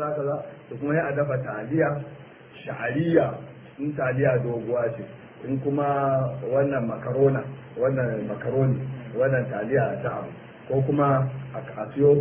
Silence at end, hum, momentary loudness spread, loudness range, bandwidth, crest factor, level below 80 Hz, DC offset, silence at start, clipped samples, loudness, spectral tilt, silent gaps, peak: 0 s; none; 15 LU; 2 LU; 3.7 kHz; 20 dB; -58 dBFS; under 0.1%; 0 s; under 0.1%; -25 LUFS; -12 dB/octave; none; -6 dBFS